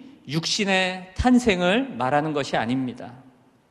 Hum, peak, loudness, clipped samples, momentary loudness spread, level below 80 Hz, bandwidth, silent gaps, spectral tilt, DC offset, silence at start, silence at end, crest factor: none; -4 dBFS; -23 LUFS; under 0.1%; 11 LU; -42 dBFS; 12 kHz; none; -4.5 dB/octave; under 0.1%; 0 s; 0.5 s; 20 dB